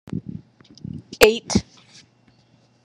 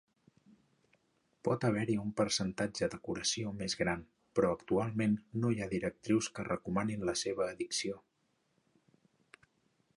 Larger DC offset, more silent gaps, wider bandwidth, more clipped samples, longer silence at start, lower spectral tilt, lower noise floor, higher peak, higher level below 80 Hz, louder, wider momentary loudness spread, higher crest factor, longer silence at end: neither; neither; about the same, 12 kHz vs 11.5 kHz; neither; second, 0.1 s vs 1.45 s; about the same, -4 dB/octave vs -4.5 dB/octave; second, -58 dBFS vs -78 dBFS; first, 0 dBFS vs -16 dBFS; first, -46 dBFS vs -64 dBFS; first, -19 LUFS vs -35 LUFS; first, 23 LU vs 5 LU; about the same, 24 dB vs 20 dB; second, 1.25 s vs 1.95 s